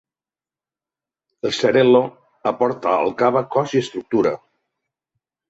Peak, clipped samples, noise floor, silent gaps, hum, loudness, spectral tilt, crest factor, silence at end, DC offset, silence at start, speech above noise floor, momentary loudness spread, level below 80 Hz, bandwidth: -4 dBFS; under 0.1%; under -90 dBFS; none; none; -19 LUFS; -5.5 dB/octave; 18 dB; 1.15 s; under 0.1%; 1.45 s; over 72 dB; 11 LU; -64 dBFS; 8 kHz